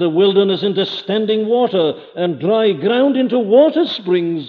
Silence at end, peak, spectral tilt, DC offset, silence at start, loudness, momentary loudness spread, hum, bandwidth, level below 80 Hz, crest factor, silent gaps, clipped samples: 0 s; -2 dBFS; -8 dB/octave; under 0.1%; 0 s; -15 LUFS; 7 LU; none; 6.2 kHz; -72 dBFS; 14 dB; none; under 0.1%